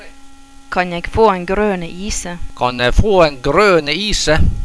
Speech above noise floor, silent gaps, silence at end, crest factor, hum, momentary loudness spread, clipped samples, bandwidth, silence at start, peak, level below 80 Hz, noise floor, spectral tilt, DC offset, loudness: 22 dB; none; 0 s; 14 dB; none; 11 LU; under 0.1%; 11 kHz; 0 s; 0 dBFS; -24 dBFS; -36 dBFS; -4.5 dB/octave; under 0.1%; -15 LUFS